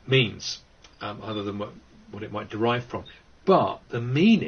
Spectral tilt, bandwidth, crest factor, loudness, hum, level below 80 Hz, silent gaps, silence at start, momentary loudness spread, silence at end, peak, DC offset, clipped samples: -6 dB/octave; 6.8 kHz; 20 dB; -26 LUFS; none; -58 dBFS; none; 0.05 s; 16 LU; 0 s; -6 dBFS; under 0.1%; under 0.1%